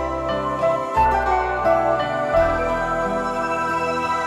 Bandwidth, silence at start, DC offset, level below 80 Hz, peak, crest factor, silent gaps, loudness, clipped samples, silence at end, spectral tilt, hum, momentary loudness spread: 13 kHz; 0 s; under 0.1%; -36 dBFS; -6 dBFS; 14 dB; none; -20 LUFS; under 0.1%; 0 s; -5.5 dB/octave; none; 4 LU